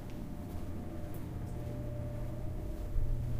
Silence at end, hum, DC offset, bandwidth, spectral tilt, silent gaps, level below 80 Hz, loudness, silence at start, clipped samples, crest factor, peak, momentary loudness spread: 0 s; none; under 0.1%; 15.5 kHz; -8 dB/octave; none; -40 dBFS; -42 LUFS; 0 s; under 0.1%; 18 dB; -18 dBFS; 4 LU